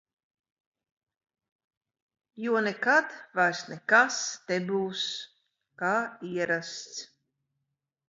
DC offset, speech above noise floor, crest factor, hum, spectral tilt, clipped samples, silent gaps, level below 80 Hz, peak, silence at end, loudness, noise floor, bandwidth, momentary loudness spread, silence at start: under 0.1%; 56 dB; 24 dB; none; -3 dB/octave; under 0.1%; none; -82 dBFS; -8 dBFS; 1.05 s; -28 LUFS; -84 dBFS; 7.8 kHz; 15 LU; 2.35 s